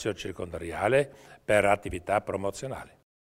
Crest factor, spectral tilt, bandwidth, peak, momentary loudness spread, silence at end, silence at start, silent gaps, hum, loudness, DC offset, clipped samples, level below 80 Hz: 22 dB; -5 dB/octave; 16 kHz; -8 dBFS; 14 LU; 0.4 s; 0 s; none; none; -28 LUFS; under 0.1%; under 0.1%; -52 dBFS